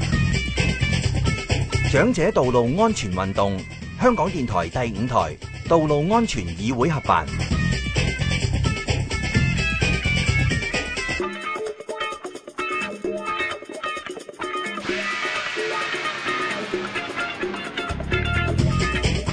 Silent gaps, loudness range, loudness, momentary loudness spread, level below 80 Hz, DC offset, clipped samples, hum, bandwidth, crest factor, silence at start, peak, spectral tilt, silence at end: none; 6 LU; -23 LUFS; 9 LU; -34 dBFS; under 0.1%; under 0.1%; none; 10.5 kHz; 20 dB; 0 s; -4 dBFS; -5.5 dB/octave; 0 s